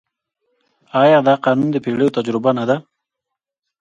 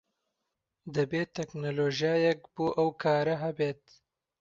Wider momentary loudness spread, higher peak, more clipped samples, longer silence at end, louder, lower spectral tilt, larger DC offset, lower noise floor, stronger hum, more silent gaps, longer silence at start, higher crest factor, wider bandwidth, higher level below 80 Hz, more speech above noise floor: about the same, 8 LU vs 9 LU; first, 0 dBFS vs -14 dBFS; neither; first, 1 s vs 0.65 s; first, -16 LUFS vs -30 LUFS; about the same, -7.5 dB/octave vs -6.5 dB/octave; neither; about the same, -82 dBFS vs -85 dBFS; neither; neither; about the same, 0.95 s vs 0.85 s; about the same, 18 dB vs 16 dB; first, 8.8 kHz vs 7.6 kHz; first, -64 dBFS vs -70 dBFS; first, 67 dB vs 55 dB